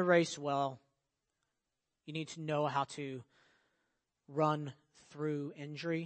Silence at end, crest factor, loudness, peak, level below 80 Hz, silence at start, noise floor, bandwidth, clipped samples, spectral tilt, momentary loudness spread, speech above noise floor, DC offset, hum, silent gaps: 0 s; 22 dB; -37 LUFS; -16 dBFS; -84 dBFS; 0 s; -88 dBFS; 8.4 kHz; under 0.1%; -5.5 dB/octave; 15 LU; 52 dB; under 0.1%; none; none